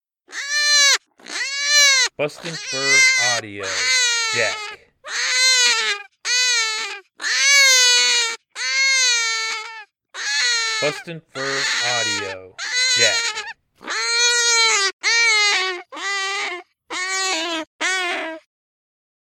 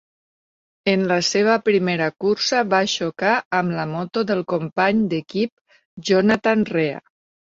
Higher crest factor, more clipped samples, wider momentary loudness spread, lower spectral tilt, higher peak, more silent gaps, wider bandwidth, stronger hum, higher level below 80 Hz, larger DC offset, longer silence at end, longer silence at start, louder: about the same, 18 dB vs 18 dB; neither; first, 16 LU vs 8 LU; second, 1 dB/octave vs -4.5 dB/octave; about the same, -2 dBFS vs -4 dBFS; second, 14.93-15.00 s, 17.67-17.79 s vs 3.45-3.51 s, 5.52-5.65 s, 5.85-5.97 s; first, 17.5 kHz vs 8 kHz; neither; second, -74 dBFS vs -62 dBFS; neither; first, 0.85 s vs 0.4 s; second, 0.3 s vs 0.85 s; first, -16 LUFS vs -20 LUFS